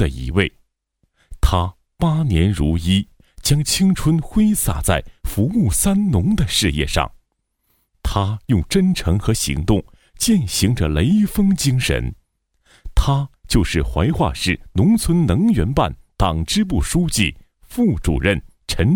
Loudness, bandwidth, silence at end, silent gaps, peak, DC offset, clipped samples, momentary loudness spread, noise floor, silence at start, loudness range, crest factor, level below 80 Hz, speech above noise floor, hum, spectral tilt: -18 LUFS; 19 kHz; 0 s; none; 0 dBFS; under 0.1%; under 0.1%; 6 LU; -70 dBFS; 0 s; 2 LU; 18 dB; -28 dBFS; 53 dB; none; -5 dB/octave